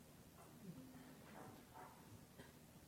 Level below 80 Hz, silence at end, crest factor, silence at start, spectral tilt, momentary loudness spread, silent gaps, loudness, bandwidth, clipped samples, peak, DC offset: -76 dBFS; 0 s; 16 dB; 0 s; -5 dB/octave; 4 LU; none; -61 LUFS; 17 kHz; under 0.1%; -44 dBFS; under 0.1%